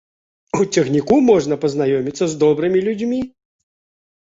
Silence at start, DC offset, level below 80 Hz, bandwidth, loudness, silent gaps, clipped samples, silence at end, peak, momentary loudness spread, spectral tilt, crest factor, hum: 0.55 s; under 0.1%; -54 dBFS; 7.8 kHz; -17 LUFS; none; under 0.1%; 1 s; -2 dBFS; 8 LU; -6 dB/octave; 16 dB; none